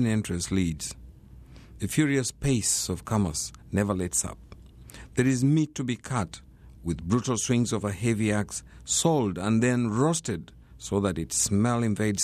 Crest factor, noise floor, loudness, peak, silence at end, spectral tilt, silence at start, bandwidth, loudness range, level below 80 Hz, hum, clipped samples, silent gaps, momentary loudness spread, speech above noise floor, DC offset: 16 dB; -48 dBFS; -27 LUFS; -10 dBFS; 0 s; -5 dB/octave; 0 s; 14 kHz; 3 LU; -48 dBFS; none; under 0.1%; none; 12 LU; 22 dB; under 0.1%